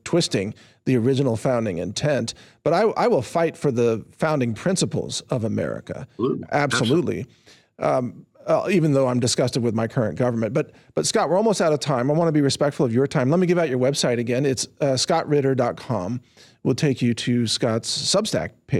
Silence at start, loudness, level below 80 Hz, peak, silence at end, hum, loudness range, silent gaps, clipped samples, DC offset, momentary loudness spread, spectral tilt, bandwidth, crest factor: 0.05 s; -22 LUFS; -60 dBFS; -8 dBFS; 0 s; none; 3 LU; none; under 0.1%; under 0.1%; 8 LU; -5 dB/octave; 14 kHz; 12 dB